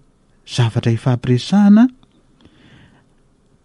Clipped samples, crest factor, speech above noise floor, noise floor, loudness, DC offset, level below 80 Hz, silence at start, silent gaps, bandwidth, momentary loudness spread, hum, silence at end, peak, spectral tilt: under 0.1%; 14 dB; 42 dB; -55 dBFS; -15 LUFS; under 0.1%; -50 dBFS; 0.5 s; none; 11 kHz; 8 LU; none; 1.75 s; -2 dBFS; -7.5 dB/octave